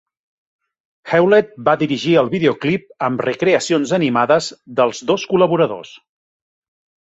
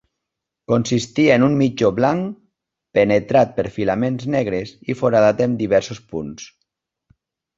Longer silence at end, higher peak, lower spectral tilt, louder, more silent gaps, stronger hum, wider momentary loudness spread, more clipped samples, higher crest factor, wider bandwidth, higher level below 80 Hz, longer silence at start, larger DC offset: about the same, 1.1 s vs 1.1 s; about the same, -2 dBFS vs -2 dBFS; about the same, -5.5 dB/octave vs -6.5 dB/octave; about the same, -16 LUFS vs -18 LUFS; neither; neither; second, 6 LU vs 14 LU; neither; about the same, 16 dB vs 18 dB; about the same, 8.2 kHz vs 7.8 kHz; second, -60 dBFS vs -52 dBFS; first, 1.05 s vs 0.7 s; neither